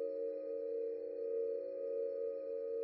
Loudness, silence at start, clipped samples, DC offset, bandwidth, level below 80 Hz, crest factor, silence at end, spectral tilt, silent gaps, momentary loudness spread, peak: -41 LUFS; 0 s; under 0.1%; under 0.1%; 4.6 kHz; under -90 dBFS; 10 dB; 0 s; -6 dB/octave; none; 3 LU; -30 dBFS